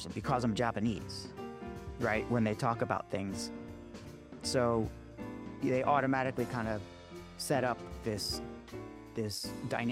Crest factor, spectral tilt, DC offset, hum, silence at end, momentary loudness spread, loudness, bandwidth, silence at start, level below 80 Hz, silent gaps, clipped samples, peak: 20 dB; -5.5 dB/octave; under 0.1%; none; 0 s; 16 LU; -35 LUFS; 16 kHz; 0 s; -56 dBFS; none; under 0.1%; -16 dBFS